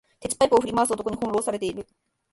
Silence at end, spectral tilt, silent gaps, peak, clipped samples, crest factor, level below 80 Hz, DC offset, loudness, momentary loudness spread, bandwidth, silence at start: 0.5 s; -4 dB/octave; none; -6 dBFS; under 0.1%; 18 dB; -54 dBFS; under 0.1%; -24 LUFS; 11 LU; 12 kHz; 0.2 s